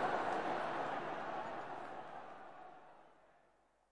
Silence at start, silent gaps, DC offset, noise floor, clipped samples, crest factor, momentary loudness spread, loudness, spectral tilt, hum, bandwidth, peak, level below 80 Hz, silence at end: 0 s; none; 0.2%; -74 dBFS; under 0.1%; 18 dB; 18 LU; -42 LUFS; -5 dB/octave; none; 11 kHz; -26 dBFS; -82 dBFS; 0 s